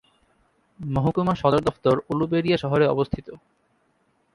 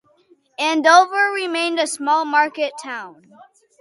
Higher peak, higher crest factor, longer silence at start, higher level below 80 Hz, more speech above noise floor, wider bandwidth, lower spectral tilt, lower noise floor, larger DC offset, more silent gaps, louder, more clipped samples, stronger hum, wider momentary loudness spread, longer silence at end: second, -4 dBFS vs 0 dBFS; about the same, 20 dB vs 18 dB; first, 0.8 s vs 0.6 s; first, -48 dBFS vs -80 dBFS; first, 44 dB vs 39 dB; about the same, 11.5 kHz vs 11.5 kHz; first, -8 dB/octave vs -0.5 dB/octave; first, -67 dBFS vs -57 dBFS; neither; neither; second, -23 LUFS vs -17 LUFS; neither; neither; second, 9 LU vs 18 LU; first, 1 s vs 0.7 s